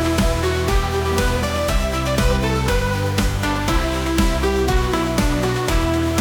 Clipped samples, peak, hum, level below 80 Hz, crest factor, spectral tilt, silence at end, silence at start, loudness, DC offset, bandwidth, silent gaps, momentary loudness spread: under 0.1%; -4 dBFS; none; -24 dBFS; 14 dB; -5 dB/octave; 0 s; 0 s; -19 LUFS; under 0.1%; 19.5 kHz; none; 2 LU